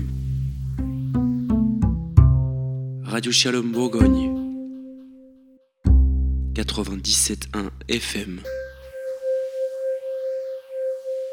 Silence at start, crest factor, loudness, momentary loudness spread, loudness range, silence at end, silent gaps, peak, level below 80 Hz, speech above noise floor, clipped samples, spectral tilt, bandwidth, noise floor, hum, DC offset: 0 s; 22 dB; -23 LUFS; 14 LU; 8 LU; 0 s; none; 0 dBFS; -28 dBFS; 32 dB; under 0.1%; -5 dB/octave; 16.5 kHz; -54 dBFS; none; under 0.1%